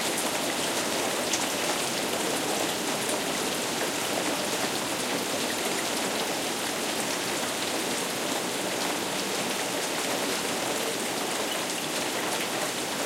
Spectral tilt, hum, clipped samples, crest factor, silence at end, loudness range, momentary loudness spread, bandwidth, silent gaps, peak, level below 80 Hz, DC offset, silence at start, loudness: -1.5 dB/octave; none; under 0.1%; 18 dB; 0 s; 1 LU; 2 LU; 16.5 kHz; none; -12 dBFS; -66 dBFS; under 0.1%; 0 s; -27 LUFS